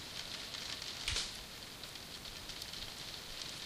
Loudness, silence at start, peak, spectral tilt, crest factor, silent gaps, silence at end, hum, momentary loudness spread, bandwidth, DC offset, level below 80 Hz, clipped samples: -42 LUFS; 0 s; -22 dBFS; -1 dB/octave; 24 dB; none; 0 s; none; 9 LU; 16 kHz; under 0.1%; -58 dBFS; under 0.1%